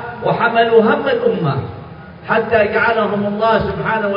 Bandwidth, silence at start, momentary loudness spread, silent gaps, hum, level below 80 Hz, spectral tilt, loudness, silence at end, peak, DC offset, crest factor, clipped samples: 5.4 kHz; 0 s; 14 LU; none; none; -46 dBFS; -9 dB/octave; -15 LUFS; 0 s; 0 dBFS; under 0.1%; 16 dB; under 0.1%